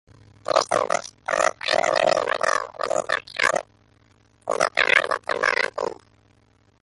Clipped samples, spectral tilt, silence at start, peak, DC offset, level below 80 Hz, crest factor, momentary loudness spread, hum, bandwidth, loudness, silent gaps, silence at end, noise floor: under 0.1%; -1.5 dB/octave; 0.5 s; -2 dBFS; under 0.1%; -64 dBFS; 22 dB; 9 LU; none; 11.5 kHz; -22 LUFS; none; 0.9 s; -60 dBFS